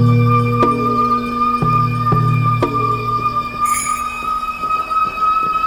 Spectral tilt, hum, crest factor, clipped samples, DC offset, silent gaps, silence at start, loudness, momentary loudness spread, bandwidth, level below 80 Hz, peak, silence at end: -6 dB/octave; none; 14 dB; under 0.1%; under 0.1%; none; 0 s; -16 LUFS; 5 LU; over 20 kHz; -40 dBFS; -2 dBFS; 0 s